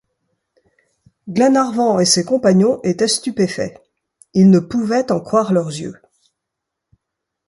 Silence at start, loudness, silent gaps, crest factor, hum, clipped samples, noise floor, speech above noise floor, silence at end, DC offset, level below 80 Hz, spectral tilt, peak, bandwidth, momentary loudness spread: 1.25 s; -16 LUFS; none; 16 dB; none; under 0.1%; -80 dBFS; 65 dB; 1.55 s; under 0.1%; -58 dBFS; -5 dB/octave; 0 dBFS; 11.5 kHz; 12 LU